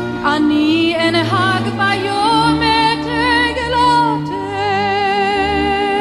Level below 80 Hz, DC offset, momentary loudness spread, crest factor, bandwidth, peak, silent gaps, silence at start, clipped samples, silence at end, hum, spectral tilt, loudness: -38 dBFS; under 0.1%; 4 LU; 14 dB; 12 kHz; -2 dBFS; none; 0 s; under 0.1%; 0 s; none; -5 dB/octave; -14 LUFS